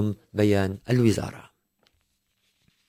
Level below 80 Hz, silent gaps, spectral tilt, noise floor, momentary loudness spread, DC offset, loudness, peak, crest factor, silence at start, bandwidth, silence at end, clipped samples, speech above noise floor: -48 dBFS; none; -7 dB/octave; -72 dBFS; 8 LU; under 0.1%; -24 LUFS; -8 dBFS; 18 dB; 0 s; 16 kHz; 1.45 s; under 0.1%; 49 dB